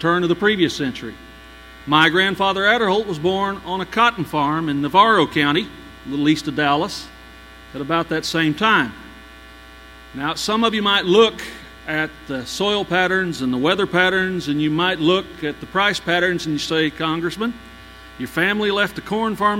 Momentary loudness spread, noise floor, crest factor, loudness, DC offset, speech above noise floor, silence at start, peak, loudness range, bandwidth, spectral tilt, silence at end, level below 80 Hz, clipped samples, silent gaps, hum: 14 LU; -41 dBFS; 20 dB; -19 LUFS; under 0.1%; 23 dB; 0 s; 0 dBFS; 4 LU; 16.5 kHz; -4.5 dB/octave; 0 s; -48 dBFS; under 0.1%; none; none